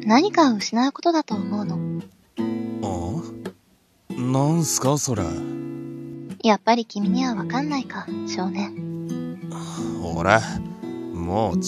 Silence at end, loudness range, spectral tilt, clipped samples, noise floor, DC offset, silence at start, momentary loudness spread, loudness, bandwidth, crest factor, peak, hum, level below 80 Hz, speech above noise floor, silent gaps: 0 s; 4 LU; -5 dB/octave; under 0.1%; -60 dBFS; under 0.1%; 0 s; 14 LU; -24 LUFS; 14 kHz; 24 dB; 0 dBFS; none; -52 dBFS; 39 dB; none